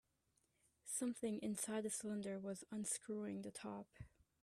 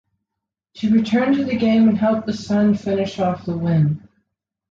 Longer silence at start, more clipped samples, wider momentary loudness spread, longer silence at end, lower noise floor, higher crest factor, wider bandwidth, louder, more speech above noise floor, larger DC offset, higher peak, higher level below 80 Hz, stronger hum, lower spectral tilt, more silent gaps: about the same, 0.85 s vs 0.75 s; neither; first, 14 LU vs 8 LU; second, 0.35 s vs 0.7 s; about the same, -83 dBFS vs -83 dBFS; first, 18 dB vs 12 dB; first, 15 kHz vs 7.4 kHz; second, -46 LUFS vs -19 LUFS; second, 37 dB vs 65 dB; neither; second, -30 dBFS vs -6 dBFS; second, -78 dBFS vs -52 dBFS; neither; second, -4 dB/octave vs -8 dB/octave; neither